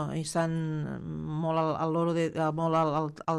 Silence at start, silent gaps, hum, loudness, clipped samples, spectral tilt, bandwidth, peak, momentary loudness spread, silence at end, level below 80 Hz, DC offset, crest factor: 0 s; none; none; -30 LUFS; under 0.1%; -6.5 dB/octave; 12 kHz; -16 dBFS; 8 LU; 0 s; -62 dBFS; under 0.1%; 14 dB